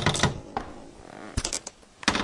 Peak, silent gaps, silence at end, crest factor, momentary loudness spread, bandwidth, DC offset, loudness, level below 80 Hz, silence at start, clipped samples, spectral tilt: -4 dBFS; none; 0 s; 26 dB; 18 LU; 11.5 kHz; under 0.1%; -29 LUFS; -44 dBFS; 0 s; under 0.1%; -3 dB/octave